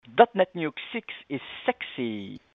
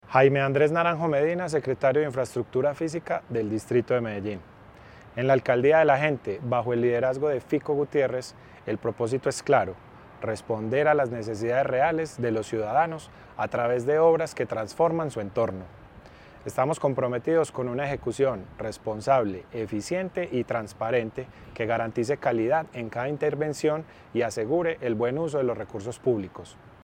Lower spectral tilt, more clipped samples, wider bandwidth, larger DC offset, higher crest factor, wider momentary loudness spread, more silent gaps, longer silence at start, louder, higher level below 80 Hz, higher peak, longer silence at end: first, -8 dB/octave vs -6.5 dB/octave; neither; second, 4.7 kHz vs 16 kHz; neither; first, 26 dB vs 20 dB; first, 15 LU vs 12 LU; neither; about the same, 0.1 s vs 0.1 s; about the same, -27 LUFS vs -26 LUFS; second, -70 dBFS vs -58 dBFS; first, -2 dBFS vs -6 dBFS; about the same, 0.15 s vs 0.15 s